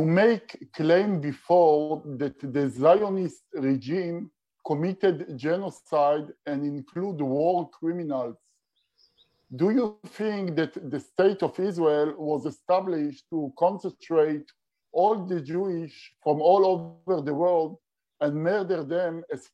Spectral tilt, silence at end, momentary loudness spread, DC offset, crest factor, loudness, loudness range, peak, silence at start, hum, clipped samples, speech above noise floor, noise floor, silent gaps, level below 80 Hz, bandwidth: -8 dB/octave; 0.15 s; 12 LU; under 0.1%; 18 dB; -26 LUFS; 5 LU; -8 dBFS; 0 s; none; under 0.1%; 48 dB; -74 dBFS; none; -76 dBFS; 10 kHz